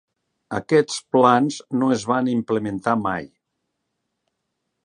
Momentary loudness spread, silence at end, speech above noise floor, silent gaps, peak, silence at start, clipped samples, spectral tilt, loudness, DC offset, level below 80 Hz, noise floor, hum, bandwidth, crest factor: 11 LU; 1.6 s; 57 dB; none; -2 dBFS; 0.5 s; under 0.1%; -5.5 dB/octave; -21 LUFS; under 0.1%; -60 dBFS; -77 dBFS; none; 10.5 kHz; 22 dB